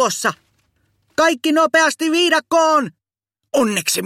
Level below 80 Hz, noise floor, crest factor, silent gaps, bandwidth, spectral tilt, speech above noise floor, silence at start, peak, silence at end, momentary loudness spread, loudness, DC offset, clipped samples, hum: -66 dBFS; -79 dBFS; 16 dB; none; 16.5 kHz; -2.5 dB/octave; 63 dB; 0 s; -2 dBFS; 0 s; 8 LU; -16 LUFS; under 0.1%; under 0.1%; none